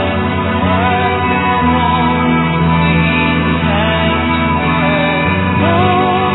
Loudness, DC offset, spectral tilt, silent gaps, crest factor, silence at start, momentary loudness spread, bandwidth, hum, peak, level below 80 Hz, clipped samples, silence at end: -12 LUFS; under 0.1%; -10 dB/octave; none; 12 dB; 0 s; 2 LU; 4.1 kHz; none; 0 dBFS; -28 dBFS; under 0.1%; 0 s